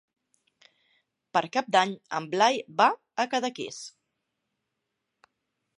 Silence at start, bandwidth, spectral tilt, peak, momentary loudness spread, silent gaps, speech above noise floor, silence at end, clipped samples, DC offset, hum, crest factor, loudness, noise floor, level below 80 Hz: 1.35 s; 11.5 kHz; -3 dB/octave; -6 dBFS; 13 LU; none; 56 dB; 1.9 s; under 0.1%; under 0.1%; none; 24 dB; -26 LUFS; -82 dBFS; -84 dBFS